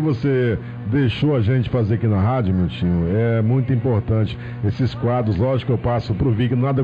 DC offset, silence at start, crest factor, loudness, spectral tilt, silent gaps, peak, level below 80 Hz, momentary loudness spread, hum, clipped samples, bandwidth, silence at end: under 0.1%; 0 s; 10 dB; -20 LUFS; -10 dB/octave; none; -10 dBFS; -38 dBFS; 3 LU; none; under 0.1%; 5.2 kHz; 0 s